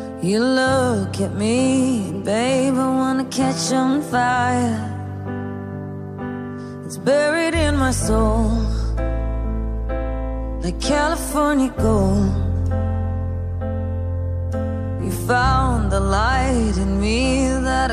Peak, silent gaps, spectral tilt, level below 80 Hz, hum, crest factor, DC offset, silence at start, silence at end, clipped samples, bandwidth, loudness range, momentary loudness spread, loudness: -6 dBFS; none; -5.5 dB/octave; -28 dBFS; none; 14 dB; under 0.1%; 0 s; 0 s; under 0.1%; 15 kHz; 4 LU; 11 LU; -20 LUFS